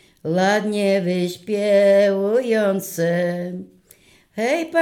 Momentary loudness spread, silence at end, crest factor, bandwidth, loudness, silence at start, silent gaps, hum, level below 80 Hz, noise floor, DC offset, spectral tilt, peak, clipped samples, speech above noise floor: 10 LU; 0 s; 14 dB; 18 kHz; -19 LUFS; 0.25 s; none; none; -68 dBFS; -53 dBFS; under 0.1%; -5.5 dB/octave; -6 dBFS; under 0.1%; 34 dB